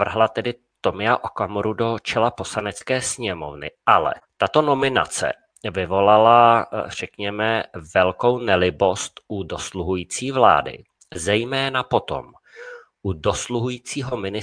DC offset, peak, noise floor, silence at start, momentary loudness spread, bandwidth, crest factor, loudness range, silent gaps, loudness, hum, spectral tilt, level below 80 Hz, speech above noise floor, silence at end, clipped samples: under 0.1%; 0 dBFS; -40 dBFS; 0 s; 14 LU; 10.5 kHz; 20 dB; 5 LU; none; -21 LUFS; none; -4 dB/octave; -50 dBFS; 20 dB; 0 s; under 0.1%